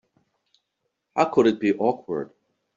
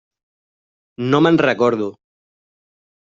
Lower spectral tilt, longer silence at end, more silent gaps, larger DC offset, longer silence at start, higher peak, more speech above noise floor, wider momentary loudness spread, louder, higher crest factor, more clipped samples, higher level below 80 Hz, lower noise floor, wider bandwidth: about the same, -5 dB/octave vs -5 dB/octave; second, 0.5 s vs 1.15 s; neither; neither; first, 1.15 s vs 1 s; about the same, -4 dBFS vs -2 dBFS; second, 57 dB vs over 74 dB; about the same, 12 LU vs 12 LU; second, -23 LUFS vs -16 LUFS; about the same, 22 dB vs 18 dB; neither; second, -66 dBFS vs -60 dBFS; second, -78 dBFS vs under -90 dBFS; about the same, 7.4 kHz vs 7.6 kHz